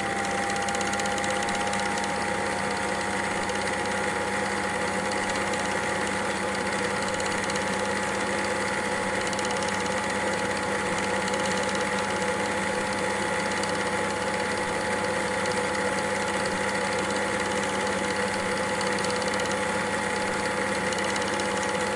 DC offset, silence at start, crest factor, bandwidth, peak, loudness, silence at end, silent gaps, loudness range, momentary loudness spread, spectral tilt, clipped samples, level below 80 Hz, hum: under 0.1%; 0 s; 16 dB; 11.5 kHz; -12 dBFS; -26 LUFS; 0 s; none; 1 LU; 1 LU; -3 dB/octave; under 0.1%; -52 dBFS; none